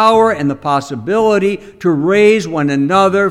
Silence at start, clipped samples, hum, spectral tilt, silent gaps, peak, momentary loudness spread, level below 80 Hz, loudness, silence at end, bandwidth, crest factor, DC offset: 0 s; under 0.1%; none; -6 dB/octave; none; 0 dBFS; 7 LU; -48 dBFS; -13 LUFS; 0 s; 12 kHz; 12 dB; under 0.1%